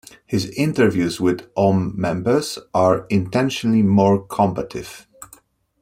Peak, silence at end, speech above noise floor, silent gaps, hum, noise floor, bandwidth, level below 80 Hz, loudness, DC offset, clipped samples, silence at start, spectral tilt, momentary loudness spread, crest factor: -2 dBFS; 0.55 s; 33 dB; none; none; -51 dBFS; 15.5 kHz; -52 dBFS; -19 LUFS; under 0.1%; under 0.1%; 0.3 s; -6.5 dB/octave; 10 LU; 16 dB